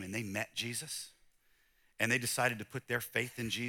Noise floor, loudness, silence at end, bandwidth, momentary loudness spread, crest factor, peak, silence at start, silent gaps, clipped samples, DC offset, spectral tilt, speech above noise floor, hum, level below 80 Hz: -71 dBFS; -35 LUFS; 0 s; 19 kHz; 11 LU; 24 dB; -14 dBFS; 0 s; none; under 0.1%; under 0.1%; -3 dB/octave; 34 dB; none; -72 dBFS